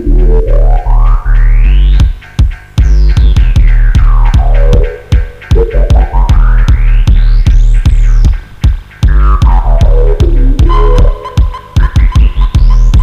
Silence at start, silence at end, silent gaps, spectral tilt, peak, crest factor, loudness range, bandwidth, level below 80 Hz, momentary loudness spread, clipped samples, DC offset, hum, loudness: 0 s; 0 s; none; -7.5 dB/octave; 0 dBFS; 4 dB; 1 LU; 6.8 kHz; -6 dBFS; 5 LU; 4%; under 0.1%; none; -10 LUFS